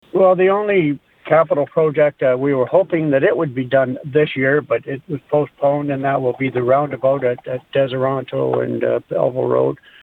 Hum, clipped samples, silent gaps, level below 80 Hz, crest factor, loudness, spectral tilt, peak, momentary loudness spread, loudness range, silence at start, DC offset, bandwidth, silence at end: none; under 0.1%; none; -60 dBFS; 16 dB; -17 LUFS; -9.5 dB/octave; -2 dBFS; 6 LU; 3 LU; 0.15 s; under 0.1%; 4.1 kHz; 0.3 s